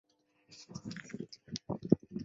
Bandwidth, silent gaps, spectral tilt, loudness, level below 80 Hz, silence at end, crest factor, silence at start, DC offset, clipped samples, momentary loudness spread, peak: 7.8 kHz; none; -7 dB/octave; -38 LUFS; -66 dBFS; 0 s; 30 dB; 0.5 s; under 0.1%; under 0.1%; 20 LU; -8 dBFS